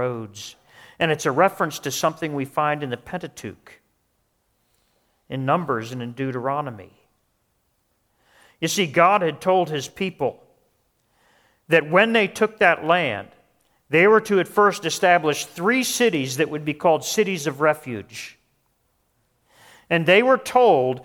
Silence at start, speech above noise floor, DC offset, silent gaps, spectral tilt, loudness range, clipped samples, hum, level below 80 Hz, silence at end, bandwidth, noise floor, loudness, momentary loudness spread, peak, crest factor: 0 s; 49 dB; under 0.1%; none; -4 dB/octave; 10 LU; under 0.1%; none; -64 dBFS; 0 s; 18.5 kHz; -69 dBFS; -20 LUFS; 16 LU; -2 dBFS; 22 dB